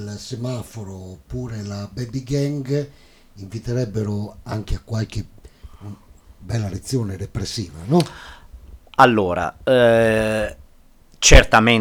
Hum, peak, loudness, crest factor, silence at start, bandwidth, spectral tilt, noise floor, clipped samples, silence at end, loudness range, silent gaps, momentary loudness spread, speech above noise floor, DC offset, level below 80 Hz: none; 0 dBFS; -20 LUFS; 20 dB; 0 s; 16.5 kHz; -4.5 dB/octave; -49 dBFS; under 0.1%; 0 s; 11 LU; none; 21 LU; 30 dB; under 0.1%; -28 dBFS